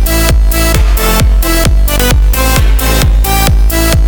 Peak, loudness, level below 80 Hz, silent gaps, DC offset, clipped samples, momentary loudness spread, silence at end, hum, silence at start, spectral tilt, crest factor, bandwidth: 0 dBFS; -10 LUFS; -8 dBFS; none; 0.4%; under 0.1%; 1 LU; 0 s; none; 0 s; -4 dB/octave; 8 dB; over 20 kHz